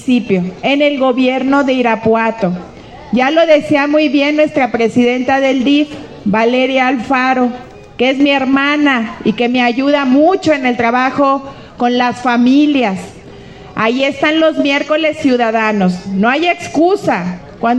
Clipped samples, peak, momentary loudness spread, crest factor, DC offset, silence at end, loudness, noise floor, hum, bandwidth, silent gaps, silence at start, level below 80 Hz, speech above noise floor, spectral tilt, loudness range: under 0.1%; 0 dBFS; 8 LU; 12 dB; under 0.1%; 0 s; -12 LUFS; -33 dBFS; none; 9.4 kHz; none; 0 s; -48 dBFS; 21 dB; -5.5 dB/octave; 2 LU